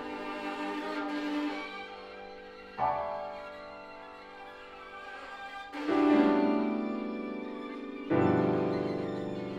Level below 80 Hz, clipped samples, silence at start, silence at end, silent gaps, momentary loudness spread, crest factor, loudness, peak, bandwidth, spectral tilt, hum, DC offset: -66 dBFS; under 0.1%; 0 s; 0 s; none; 20 LU; 20 dB; -32 LUFS; -12 dBFS; 8.6 kHz; -7.5 dB/octave; none; under 0.1%